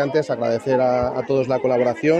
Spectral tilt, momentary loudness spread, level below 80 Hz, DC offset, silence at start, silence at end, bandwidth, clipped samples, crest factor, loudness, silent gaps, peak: -7 dB/octave; 3 LU; -50 dBFS; under 0.1%; 0 s; 0 s; 9.2 kHz; under 0.1%; 14 dB; -20 LUFS; none; -6 dBFS